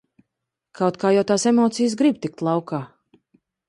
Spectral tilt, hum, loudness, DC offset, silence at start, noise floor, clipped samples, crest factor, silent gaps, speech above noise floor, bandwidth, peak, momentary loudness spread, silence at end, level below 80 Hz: -5.5 dB/octave; none; -21 LUFS; under 0.1%; 0.8 s; -82 dBFS; under 0.1%; 16 dB; none; 62 dB; 11 kHz; -6 dBFS; 11 LU; 0.8 s; -66 dBFS